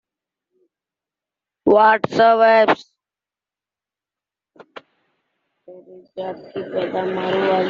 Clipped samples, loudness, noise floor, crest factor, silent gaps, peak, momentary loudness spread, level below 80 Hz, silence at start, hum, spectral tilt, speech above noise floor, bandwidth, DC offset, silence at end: under 0.1%; -16 LUFS; -90 dBFS; 18 dB; none; -2 dBFS; 17 LU; -64 dBFS; 1.65 s; none; -3 dB/octave; 73 dB; 7.2 kHz; under 0.1%; 0 s